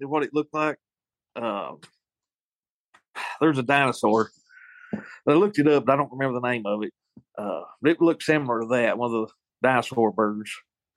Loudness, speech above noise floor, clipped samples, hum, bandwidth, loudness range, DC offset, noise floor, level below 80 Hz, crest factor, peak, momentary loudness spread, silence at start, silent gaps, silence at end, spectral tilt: -24 LUFS; over 66 dB; under 0.1%; none; 12.5 kHz; 6 LU; under 0.1%; under -90 dBFS; -72 dBFS; 20 dB; -6 dBFS; 16 LU; 0 s; 2.35-2.63 s, 2.69-2.93 s, 3.10-3.14 s; 0.35 s; -6 dB/octave